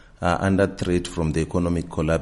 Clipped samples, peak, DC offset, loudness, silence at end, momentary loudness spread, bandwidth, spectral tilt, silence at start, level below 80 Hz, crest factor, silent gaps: under 0.1%; -6 dBFS; under 0.1%; -23 LUFS; 0 s; 4 LU; 11.5 kHz; -6.5 dB/octave; 0.2 s; -38 dBFS; 18 dB; none